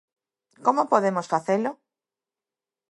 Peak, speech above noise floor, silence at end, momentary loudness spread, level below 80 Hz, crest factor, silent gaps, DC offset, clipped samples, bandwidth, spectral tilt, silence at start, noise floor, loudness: -4 dBFS; over 67 dB; 1.15 s; 5 LU; -80 dBFS; 22 dB; none; under 0.1%; under 0.1%; 11.5 kHz; -6 dB/octave; 0.6 s; under -90 dBFS; -24 LUFS